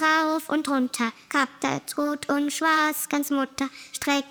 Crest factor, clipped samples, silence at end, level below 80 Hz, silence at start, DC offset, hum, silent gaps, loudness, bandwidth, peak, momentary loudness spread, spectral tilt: 14 dB; under 0.1%; 0 s; -68 dBFS; 0 s; under 0.1%; none; none; -25 LUFS; over 20 kHz; -10 dBFS; 7 LU; -2.5 dB/octave